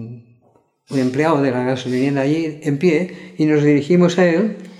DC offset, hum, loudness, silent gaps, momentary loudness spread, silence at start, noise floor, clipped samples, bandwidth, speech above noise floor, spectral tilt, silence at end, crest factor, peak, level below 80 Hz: under 0.1%; none; -17 LUFS; none; 7 LU; 0 s; -57 dBFS; under 0.1%; 11.5 kHz; 41 dB; -7 dB/octave; 0.05 s; 14 dB; -4 dBFS; -64 dBFS